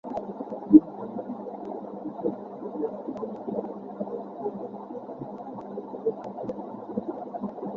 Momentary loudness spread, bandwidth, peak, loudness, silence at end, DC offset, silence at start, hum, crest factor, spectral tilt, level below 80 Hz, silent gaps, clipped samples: 11 LU; 4 kHz; -2 dBFS; -30 LUFS; 0 s; under 0.1%; 0.05 s; none; 28 dB; -11 dB/octave; -68 dBFS; none; under 0.1%